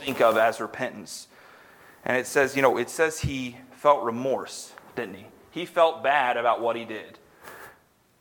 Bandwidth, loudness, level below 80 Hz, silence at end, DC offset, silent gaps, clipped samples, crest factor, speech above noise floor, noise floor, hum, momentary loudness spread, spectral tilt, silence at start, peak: 19 kHz; -25 LUFS; -54 dBFS; 0.5 s; under 0.1%; none; under 0.1%; 22 dB; 34 dB; -59 dBFS; none; 18 LU; -4 dB/octave; 0 s; -4 dBFS